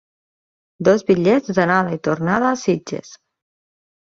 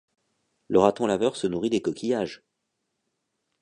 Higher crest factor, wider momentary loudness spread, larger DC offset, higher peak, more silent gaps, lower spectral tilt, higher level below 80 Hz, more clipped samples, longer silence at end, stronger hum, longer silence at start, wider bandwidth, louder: about the same, 18 dB vs 22 dB; about the same, 7 LU vs 7 LU; neither; first, -2 dBFS vs -6 dBFS; neither; about the same, -6.5 dB/octave vs -5.5 dB/octave; about the same, -58 dBFS vs -60 dBFS; neither; second, 0.9 s vs 1.25 s; neither; about the same, 0.8 s vs 0.7 s; second, 7.6 kHz vs 10.5 kHz; first, -18 LUFS vs -25 LUFS